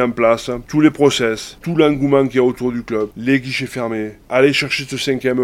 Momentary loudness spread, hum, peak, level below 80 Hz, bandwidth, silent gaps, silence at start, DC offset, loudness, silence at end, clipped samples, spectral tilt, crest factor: 9 LU; none; 0 dBFS; -46 dBFS; 16 kHz; none; 0 s; under 0.1%; -17 LUFS; 0 s; under 0.1%; -5.5 dB/octave; 16 dB